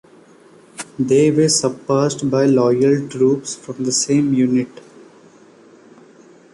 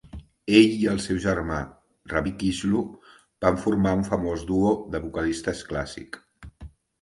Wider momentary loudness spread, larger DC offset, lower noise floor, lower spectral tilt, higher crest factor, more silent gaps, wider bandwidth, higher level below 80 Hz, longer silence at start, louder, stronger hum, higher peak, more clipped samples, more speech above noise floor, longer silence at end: second, 10 LU vs 19 LU; neither; about the same, -47 dBFS vs -46 dBFS; about the same, -5 dB/octave vs -6 dB/octave; second, 14 dB vs 22 dB; neither; about the same, 11.5 kHz vs 11.5 kHz; second, -58 dBFS vs -44 dBFS; first, 0.8 s vs 0.05 s; first, -16 LUFS vs -24 LUFS; neither; about the same, -4 dBFS vs -2 dBFS; neither; first, 31 dB vs 22 dB; first, 1.85 s vs 0.35 s